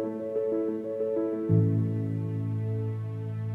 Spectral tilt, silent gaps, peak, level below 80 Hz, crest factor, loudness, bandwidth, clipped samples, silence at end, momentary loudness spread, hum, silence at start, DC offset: -11.5 dB/octave; none; -12 dBFS; -68 dBFS; 16 dB; -29 LUFS; 3 kHz; under 0.1%; 0 s; 8 LU; none; 0 s; under 0.1%